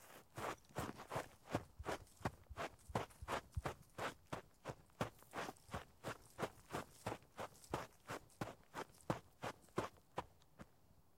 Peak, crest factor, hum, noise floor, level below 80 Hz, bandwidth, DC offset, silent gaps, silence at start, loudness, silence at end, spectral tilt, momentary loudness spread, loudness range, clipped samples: -24 dBFS; 26 dB; none; -72 dBFS; -64 dBFS; 16.5 kHz; under 0.1%; none; 0 s; -50 LUFS; 0.15 s; -5 dB/octave; 7 LU; 2 LU; under 0.1%